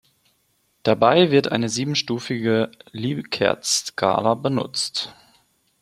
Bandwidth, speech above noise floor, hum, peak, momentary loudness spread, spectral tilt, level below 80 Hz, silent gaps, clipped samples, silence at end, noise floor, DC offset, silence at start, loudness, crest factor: 15 kHz; 46 dB; none; -2 dBFS; 11 LU; -4 dB/octave; -62 dBFS; none; under 0.1%; 0.7 s; -66 dBFS; under 0.1%; 0.85 s; -21 LUFS; 20 dB